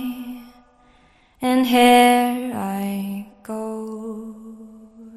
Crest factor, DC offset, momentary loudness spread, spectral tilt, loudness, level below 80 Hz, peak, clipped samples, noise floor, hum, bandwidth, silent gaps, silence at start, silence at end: 20 dB; under 0.1%; 23 LU; -4 dB/octave; -19 LUFS; -60 dBFS; -2 dBFS; under 0.1%; -55 dBFS; none; 14.5 kHz; none; 0 s; 0 s